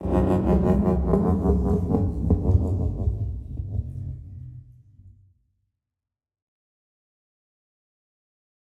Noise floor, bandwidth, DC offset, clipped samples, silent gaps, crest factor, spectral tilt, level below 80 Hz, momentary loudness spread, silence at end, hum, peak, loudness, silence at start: -88 dBFS; 7.8 kHz; under 0.1%; under 0.1%; none; 18 dB; -11 dB/octave; -32 dBFS; 15 LU; 3.65 s; none; -6 dBFS; -24 LUFS; 0 s